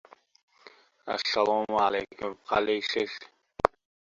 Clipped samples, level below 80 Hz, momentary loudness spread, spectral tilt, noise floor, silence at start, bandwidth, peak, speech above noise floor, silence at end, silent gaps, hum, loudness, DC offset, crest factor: under 0.1%; -60 dBFS; 12 LU; -3.5 dB/octave; -56 dBFS; 1.05 s; 7.6 kHz; 0 dBFS; 28 dB; 0.45 s; none; none; -28 LUFS; under 0.1%; 30 dB